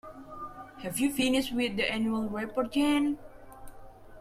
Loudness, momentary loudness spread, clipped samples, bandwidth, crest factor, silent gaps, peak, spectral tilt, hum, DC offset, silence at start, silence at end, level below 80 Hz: -29 LUFS; 16 LU; under 0.1%; 15.5 kHz; 16 dB; none; -16 dBFS; -4 dB/octave; none; under 0.1%; 0.05 s; 0 s; -54 dBFS